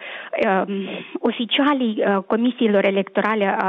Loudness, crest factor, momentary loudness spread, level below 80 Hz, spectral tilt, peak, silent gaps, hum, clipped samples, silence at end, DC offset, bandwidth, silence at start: -20 LUFS; 16 dB; 8 LU; -68 dBFS; -8 dB/octave; -4 dBFS; none; none; under 0.1%; 0 s; under 0.1%; 5.6 kHz; 0 s